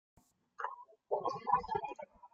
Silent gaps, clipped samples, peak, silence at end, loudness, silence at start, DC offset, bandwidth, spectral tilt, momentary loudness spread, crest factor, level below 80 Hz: none; under 0.1%; -16 dBFS; 0.05 s; -38 LUFS; 0.6 s; under 0.1%; 8 kHz; -5.5 dB/octave; 14 LU; 24 dB; -68 dBFS